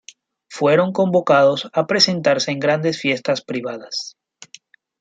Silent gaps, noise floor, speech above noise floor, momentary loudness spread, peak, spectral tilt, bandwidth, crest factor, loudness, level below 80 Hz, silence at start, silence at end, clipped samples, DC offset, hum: none; -48 dBFS; 30 dB; 12 LU; -2 dBFS; -4.5 dB/octave; 9.2 kHz; 18 dB; -18 LUFS; -68 dBFS; 0.5 s; 0.9 s; under 0.1%; under 0.1%; none